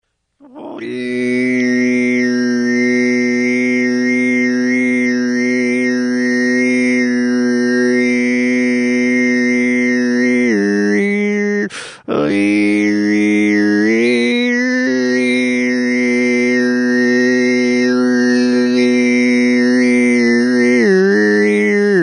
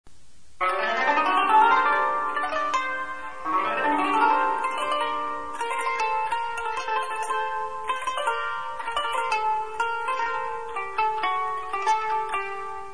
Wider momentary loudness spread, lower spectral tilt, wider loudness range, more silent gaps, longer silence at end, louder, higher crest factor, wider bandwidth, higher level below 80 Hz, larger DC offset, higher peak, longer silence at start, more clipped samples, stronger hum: second, 3 LU vs 9 LU; first, -5 dB/octave vs -2 dB/octave; about the same, 3 LU vs 5 LU; neither; about the same, 0 s vs 0 s; first, -13 LUFS vs -25 LUFS; second, 12 dB vs 18 dB; about the same, 10 kHz vs 11 kHz; about the same, -60 dBFS vs -58 dBFS; second, under 0.1% vs 1%; first, -2 dBFS vs -8 dBFS; first, 0.55 s vs 0 s; neither; neither